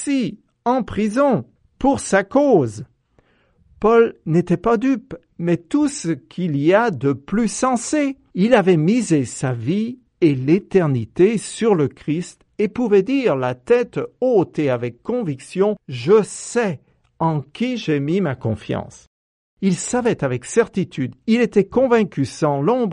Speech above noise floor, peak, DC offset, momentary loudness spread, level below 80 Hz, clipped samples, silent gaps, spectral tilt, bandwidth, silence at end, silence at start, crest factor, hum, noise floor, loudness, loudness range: 41 dB; -2 dBFS; under 0.1%; 9 LU; -50 dBFS; under 0.1%; 19.07-19.57 s; -6 dB/octave; 11.5 kHz; 0 s; 0 s; 16 dB; none; -59 dBFS; -19 LUFS; 4 LU